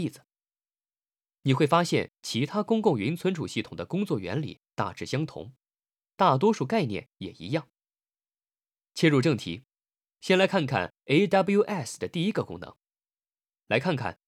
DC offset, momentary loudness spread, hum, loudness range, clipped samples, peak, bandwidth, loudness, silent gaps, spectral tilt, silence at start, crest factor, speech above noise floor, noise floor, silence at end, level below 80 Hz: under 0.1%; 14 LU; none; 4 LU; under 0.1%; -6 dBFS; 15 kHz; -27 LUFS; none; -6 dB/octave; 0 s; 22 dB; over 63 dB; under -90 dBFS; 0.15 s; -70 dBFS